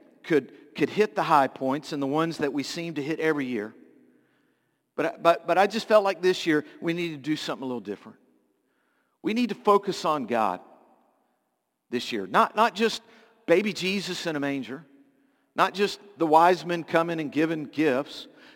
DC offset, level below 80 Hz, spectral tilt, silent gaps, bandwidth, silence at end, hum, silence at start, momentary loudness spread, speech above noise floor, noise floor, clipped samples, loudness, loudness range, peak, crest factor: under 0.1%; -76 dBFS; -5 dB/octave; none; 17 kHz; 0.3 s; none; 0.25 s; 13 LU; 52 dB; -77 dBFS; under 0.1%; -26 LUFS; 4 LU; -4 dBFS; 22 dB